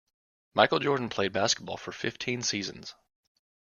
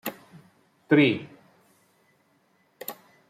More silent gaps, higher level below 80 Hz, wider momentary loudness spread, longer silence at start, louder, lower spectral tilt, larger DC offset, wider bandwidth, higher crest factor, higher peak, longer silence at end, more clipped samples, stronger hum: neither; first, -66 dBFS vs -72 dBFS; second, 14 LU vs 20 LU; first, 0.55 s vs 0.05 s; second, -29 LUFS vs -23 LUFS; second, -3 dB/octave vs -6 dB/octave; neither; second, 11 kHz vs 15.5 kHz; about the same, 26 dB vs 22 dB; about the same, -6 dBFS vs -8 dBFS; first, 0.9 s vs 0.35 s; neither; neither